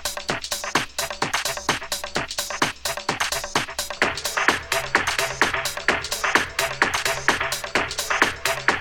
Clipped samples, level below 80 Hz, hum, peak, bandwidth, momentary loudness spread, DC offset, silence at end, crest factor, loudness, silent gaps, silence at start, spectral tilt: under 0.1%; -46 dBFS; none; -2 dBFS; over 20 kHz; 6 LU; 0.1%; 0 s; 22 dB; -23 LUFS; none; 0 s; -1.5 dB/octave